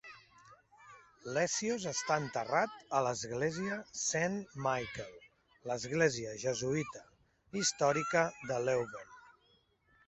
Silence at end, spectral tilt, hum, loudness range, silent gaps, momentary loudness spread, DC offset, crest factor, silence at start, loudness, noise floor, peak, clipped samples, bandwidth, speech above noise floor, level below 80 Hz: 0.75 s; -3.5 dB/octave; none; 2 LU; none; 14 LU; under 0.1%; 22 dB; 0.05 s; -35 LUFS; -71 dBFS; -14 dBFS; under 0.1%; 8.2 kHz; 37 dB; -70 dBFS